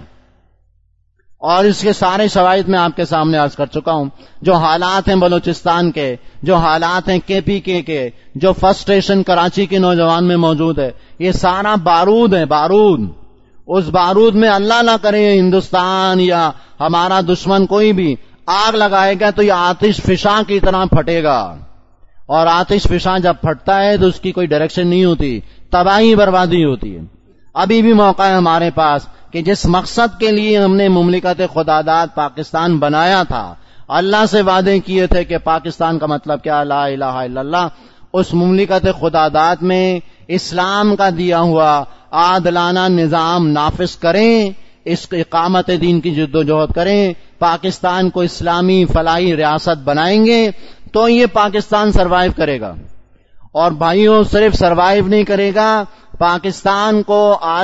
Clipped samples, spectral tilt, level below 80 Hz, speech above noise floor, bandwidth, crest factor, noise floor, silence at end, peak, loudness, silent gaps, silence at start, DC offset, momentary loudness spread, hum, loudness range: under 0.1%; -6 dB/octave; -32 dBFS; 44 dB; 8 kHz; 12 dB; -56 dBFS; 0 s; 0 dBFS; -13 LUFS; none; 0 s; under 0.1%; 8 LU; none; 3 LU